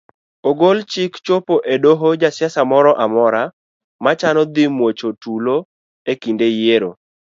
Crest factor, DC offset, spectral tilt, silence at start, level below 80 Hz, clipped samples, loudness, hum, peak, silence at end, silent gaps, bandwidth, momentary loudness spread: 16 dB; under 0.1%; -6 dB/octave; 0.45 s; -66 dBFS; under 0.1%; -16 LUFS; none; 0 dBFS; 0.45 s; 3.53-3.99 s, 5.65-6.06 s; 7.6 kHz; 10 LU